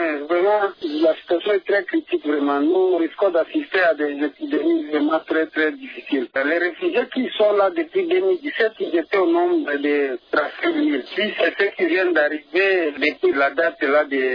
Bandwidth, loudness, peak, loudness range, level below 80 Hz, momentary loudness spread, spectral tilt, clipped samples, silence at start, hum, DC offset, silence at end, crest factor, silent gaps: 5.2 kHz; -20 LUFS; -6 dBFS; 2 LU; -68 dBFS; 5 LU; -6 dB/octave; under 0.1%; 0 s; none; under 0.1%; 0 s; 14 dB; none